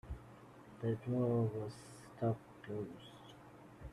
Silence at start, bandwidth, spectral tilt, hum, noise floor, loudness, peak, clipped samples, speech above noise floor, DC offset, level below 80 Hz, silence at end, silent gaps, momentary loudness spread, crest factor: 0.05 s; 12 kHz; -8.5 dB/octave; none; -58 dBFS; -40 LUFS; -24 dBFS; under 0.1%; 20 dB; under 0.1%; -62 dBFS; 0 s; none; 22 LU; 16 dB